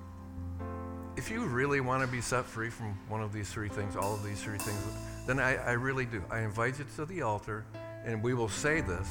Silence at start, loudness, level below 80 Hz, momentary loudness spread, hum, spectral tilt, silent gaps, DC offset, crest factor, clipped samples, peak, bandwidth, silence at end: 0 s; -34 LUFS; -52 dBFS; 11 LU; none; -5.5 dB/octave; none; under 0.1%; 20 dB; under 0.1%; -16 dBFS; 18 kHz; 0 s